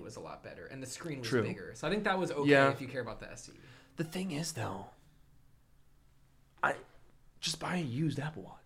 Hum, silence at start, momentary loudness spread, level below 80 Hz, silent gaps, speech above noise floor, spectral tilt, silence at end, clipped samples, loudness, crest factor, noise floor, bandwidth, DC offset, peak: none; 0 s; 19 LU; -62 dBFS; none; 29 dB; -5 dB/octave; 0.1 s; under 0.1%; -34 LUFS; 24 dB; -64 dBFS; 16 kHz; under 0.1%; -12 dBFS